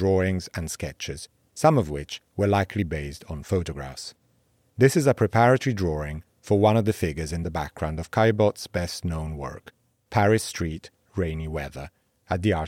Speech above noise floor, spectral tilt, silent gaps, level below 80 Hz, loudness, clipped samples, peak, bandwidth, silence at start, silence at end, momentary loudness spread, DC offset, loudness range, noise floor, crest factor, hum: 41 dB; -6 dB/octave; none; -46 dBFS; -25 LUFS; under 0.1%; -4 dBFS; 16 kHz; 0 s; 0 s; 17 LU; under 0.1%; 5 LU; -66 dBFS; 20 dB; none